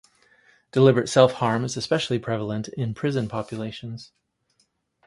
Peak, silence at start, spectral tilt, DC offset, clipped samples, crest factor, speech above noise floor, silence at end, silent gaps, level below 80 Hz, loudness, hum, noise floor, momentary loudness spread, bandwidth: -2 dBFS; 0.75 s; -6 dB/octave; under 0.1%; under 0.1%; 22 dB; 46 dB; 1.05 s; none; -60 dBFS; -23 LUFS; none; -69 dBFS; 15 LU; 11.5 kHz